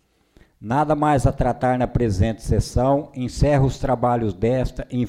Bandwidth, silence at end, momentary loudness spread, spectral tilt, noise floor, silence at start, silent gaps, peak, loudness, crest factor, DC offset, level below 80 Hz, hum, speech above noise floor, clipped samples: 12.5 kHz; 0 s; 6 LU; -7.5 dB/octave; -55 dBFS; 0.6 s; none; -6 dBFS; -21 LUFS; 14 dB; under 0.1%; -32 dBFS; none; 36 dB; under 0.1%